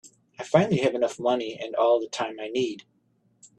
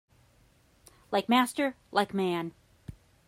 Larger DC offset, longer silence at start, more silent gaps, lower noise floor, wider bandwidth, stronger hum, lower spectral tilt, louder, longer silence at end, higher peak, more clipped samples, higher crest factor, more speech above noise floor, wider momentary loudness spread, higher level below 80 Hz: neither; second, 0.05 s vs 1.1 s; neither; about the same, -67 dBFS vs -64 dBFS; second, 10 kHz vs 16 kHz; neither; about the same, -5.5 dB/octave vs -4.5 dB/octave; first, -25 LUFS vs -29 LUFS; second, 0.1 s vs 0.35 s; first, -4 dBFS vs -12 dBFS; neither; about the same, 22 dB vs 20 dB; first, 42 dB vs 35 dB; second, 9 LU vs 25 LU; about the same, -66 dBFS vs -64 dBFS